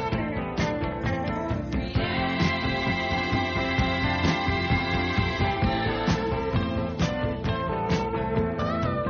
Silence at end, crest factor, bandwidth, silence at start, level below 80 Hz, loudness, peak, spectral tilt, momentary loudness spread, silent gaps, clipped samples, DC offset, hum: 0 s; 14 dB; 7.2 kHz; 0 s; -38 dBFS; -26 LUFS; -12 dBFS; -4.5 dB/octave; 4 LU; none; under 0.1%; under 0.1%; none